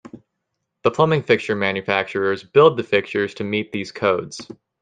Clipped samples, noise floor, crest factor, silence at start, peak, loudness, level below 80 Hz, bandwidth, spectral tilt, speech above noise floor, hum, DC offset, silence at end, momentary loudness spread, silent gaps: under 0.1%; -77 dBFS; 18 dB; 0.15 s; -2 dBFS; -20 LUFS; -60 dBFS; 9.4 kHz; -6 dB/octave; 58 dB; none; under 0.1%; 0.3 s; 10 LU; none